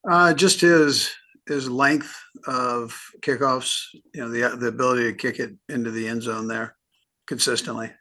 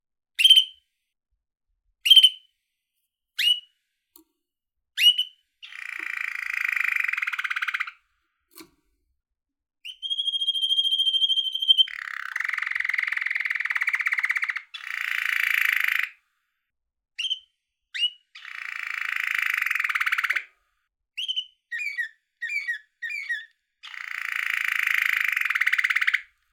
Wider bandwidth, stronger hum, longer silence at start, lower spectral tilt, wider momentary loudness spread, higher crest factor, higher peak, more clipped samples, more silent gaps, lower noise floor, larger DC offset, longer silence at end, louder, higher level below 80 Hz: second, 12.5 kHz vs 17.5 kHz; neither; second, 0.05 s vs 0.4 s; first, -3.5 dB/octave vs 5.5 dB/octave; about the same, 18 LU vs 16 LU; about the same, 20 dB vs 24 dB; about the same, -4 dBFS vs -4 dBFS; neither; neither; second, -50 dBFS vs -82 dBFS; neither; second, 0.1 s vs 0.3 s; about the same, -22 LUFS vs -22 LUFS; first, -70 dBFS vs -82 dBFS